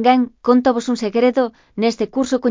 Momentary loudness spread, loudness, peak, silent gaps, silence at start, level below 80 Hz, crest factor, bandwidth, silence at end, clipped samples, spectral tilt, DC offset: 6 LU; -18 LUFS; 0 dBFS; none; 0 s; -56 dBFS; 16 dB; 7.6 kHz; 0 s; under 0.1%; -5 dB/octave; under 0.1%